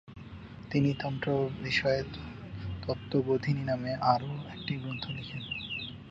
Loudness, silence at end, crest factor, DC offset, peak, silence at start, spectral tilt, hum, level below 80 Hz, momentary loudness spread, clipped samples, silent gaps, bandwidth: -32 LUFS; 0 s; 22 dB; under 0.1%; -10 dBFS; 0.05 s; -7 dB/octave; none; -54 dBFS; 14 LU; under 0.1%; none; 7.6 kHz